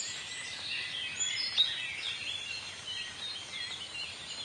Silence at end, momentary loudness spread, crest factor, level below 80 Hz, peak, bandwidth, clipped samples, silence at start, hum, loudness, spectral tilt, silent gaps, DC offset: 0 s; 10 LU; 22 dB; -72 dBFS; -16 dBFS; 11.5 kHz; under 0.1%; 0 s; none; -34 LUFS; 1 dB/octave; none; under 0.1%